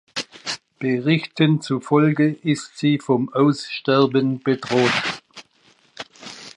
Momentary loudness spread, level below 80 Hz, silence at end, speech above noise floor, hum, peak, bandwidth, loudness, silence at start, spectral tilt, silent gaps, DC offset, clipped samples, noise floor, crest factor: 14 LU; -68 dBFS; 0.05 s; 38 dB; none; -4 dBFS; 11 kHz; -20 LUFS; 0.15 s; -6 dB/octave; none; under 0.1%; under 0.1%; -57 dBFS; 16 dB